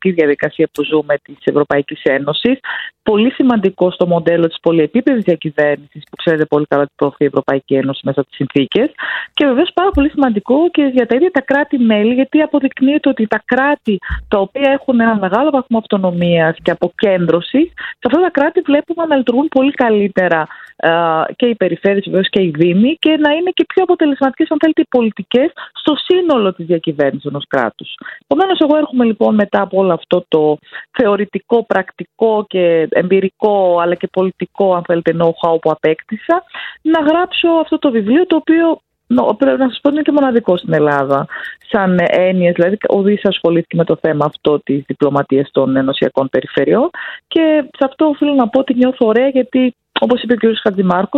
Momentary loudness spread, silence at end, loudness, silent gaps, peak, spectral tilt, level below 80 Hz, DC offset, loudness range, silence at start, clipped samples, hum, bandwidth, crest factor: 5 LU; 0 s; -14 LUFS; none; 0 dBFS; -8.5 dB/octave; -44 dBFS; under 0.1%; 2 LU; 0 s; under 0.1%; none; 5.4 kHz; 14 dB